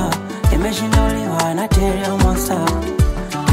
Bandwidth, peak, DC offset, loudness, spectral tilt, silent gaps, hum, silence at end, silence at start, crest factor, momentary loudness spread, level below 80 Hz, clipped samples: 16 kHz; -2 dBFS; under 0.1%; -18 LUFS; -5.5 dB/octave; none; none; 0 s; 0 s; 14 dB; 3 LU; -22 dBFS; under 0.1%